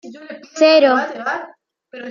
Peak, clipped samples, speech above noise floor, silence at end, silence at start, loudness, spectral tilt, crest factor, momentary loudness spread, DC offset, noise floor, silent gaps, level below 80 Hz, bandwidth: -2 dBFS; under 0.1%; 22 dB; 0 s; 0.05 s; -15 LUFS; -2.5 dB/octave; 16 dB; 23 LU; under 0.1%; -38 dBFS; none; -76 dBFS; 7.4 kHz